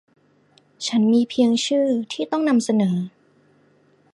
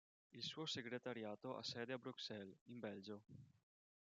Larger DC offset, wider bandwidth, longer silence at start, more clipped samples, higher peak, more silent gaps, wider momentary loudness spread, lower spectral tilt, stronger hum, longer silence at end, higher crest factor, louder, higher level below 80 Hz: neither; first, 11.5 kHz vs 9 kHz; first, 0.8 s vs 0.35 s; neither; first, -6 dBFS vs -34 dBFS; second, none vs 2.61-2.66 s; second, 8 LU vs 11 LU; first, -5.5 dB/octave vs -4 dB/octave; neither; first, 1.05 s vs 0.55 s; about the same, 16 dB vs 20 dB; first, -20 LUFS vs -51 LUFS; first, -70 dBFS vs under -90 dBFS